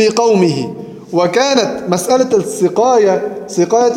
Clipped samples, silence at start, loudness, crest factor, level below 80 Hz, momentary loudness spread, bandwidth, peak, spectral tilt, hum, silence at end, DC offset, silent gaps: under 0.1%; 0 s; -13 LUFS; 12 dB; -58 dBFS; 9 LU; 16 kHz; 0 dBFS; -4.5 dB/octave; none; 0 s; under 0.1%; none